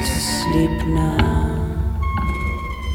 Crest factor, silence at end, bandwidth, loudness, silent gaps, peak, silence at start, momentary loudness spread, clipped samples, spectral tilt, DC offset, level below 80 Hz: 18 dB; 0 s; 18 kHz; -20 LUFS; none; -2 dBFS; 0 s; 6 LU; under 0.1%; -5.5 dB/octave; under 0.1%; -24 dBFS